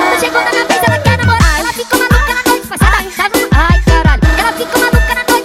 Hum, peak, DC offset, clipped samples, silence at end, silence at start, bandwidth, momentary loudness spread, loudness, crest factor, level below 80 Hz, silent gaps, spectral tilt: none; 0 dBFS; under 0.1%; under 0.1%; 0 s; 0 s; 16.5 kHz; 3 LU; -11 LUFS; 10 dB; -16 dBFS; none; -4.5 dB/octave